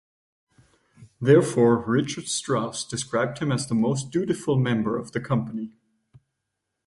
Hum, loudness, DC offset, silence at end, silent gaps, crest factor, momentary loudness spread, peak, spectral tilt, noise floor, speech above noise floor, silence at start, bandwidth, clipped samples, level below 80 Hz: none; -24 LUFS; under 0.1%; 1.15 s; none; 20 dB; 10 LU; -4 dBFS; -5.5 dB/octave; -81 dBFS; 58 dB; 1 s; 11.5 kHz; under 0.1%; -60 dBFS